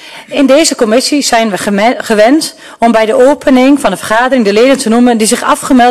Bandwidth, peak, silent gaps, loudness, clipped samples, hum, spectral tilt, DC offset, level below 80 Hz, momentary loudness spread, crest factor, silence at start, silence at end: 13.5 kHz; 0 dBFS; none; -8 LUFS; under 0.1%; none; -3.5 dB/octave; 0.7%; -42 dBFS; 5 LU; 8 dB; 0 s; 0 s